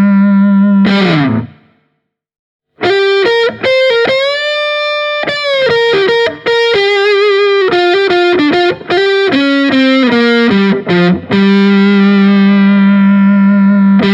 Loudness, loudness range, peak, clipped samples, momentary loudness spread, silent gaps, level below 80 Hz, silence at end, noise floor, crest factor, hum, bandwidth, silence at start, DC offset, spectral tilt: -9 LUFS; 4 LU; 0 dBFS; under 0.1%; 5 LU; 2.39-2.60 s; -52 dBFS; 0 s; -65 dBFS; 8 dB; none; 7.6 kHz; 0 s; under 0.1%; -7 dB/octave